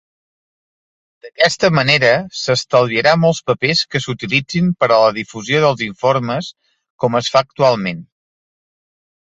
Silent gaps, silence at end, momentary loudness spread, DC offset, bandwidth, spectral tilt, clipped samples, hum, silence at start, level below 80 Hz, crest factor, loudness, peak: 6.90-6.98 s; 1.35 s; 9 LU; under 0.1%; 8.2 kHz; -4.5 dB/octave; under 0.1%; none; 1.25 s; -54 dBFS; 16 dB; -15 LUFS; 0 dBFS